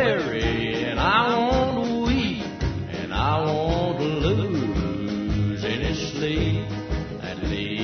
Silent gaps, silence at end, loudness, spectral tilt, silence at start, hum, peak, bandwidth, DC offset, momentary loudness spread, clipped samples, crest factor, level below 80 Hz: none; 0 s; -24 LUFS; -6.5 dB/octave; 0 s; none; -6 dBFS; 6.6 kHz; under 0.1%; 8 LU; under 0.1%; 18 dB; -34 dBFS